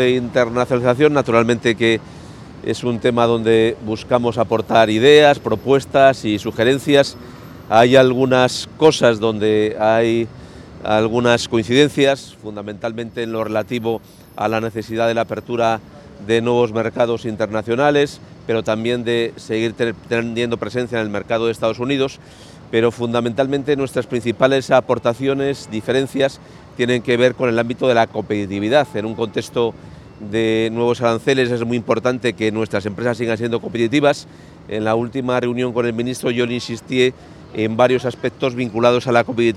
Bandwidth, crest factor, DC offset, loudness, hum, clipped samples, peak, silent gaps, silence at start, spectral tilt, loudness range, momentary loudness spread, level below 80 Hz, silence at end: 13 kHz; 18 dB; under 0.1%; -17 LUFS; none; under 0.1%; 0 dBFS; none; 0 s; -5.5 dB/octave; 6 LU; 10 LU; -50 dBFS; 0 s